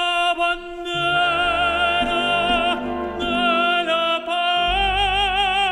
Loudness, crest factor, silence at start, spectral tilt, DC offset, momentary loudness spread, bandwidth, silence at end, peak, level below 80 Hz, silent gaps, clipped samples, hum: -19 LUFS; 12 dB; 0 s; -3.5 dB/octave; under 0.1%; 5 LU; 12 kHz; 0 s; -8 dBFS; -38 dBFS; none; under 0.1%; none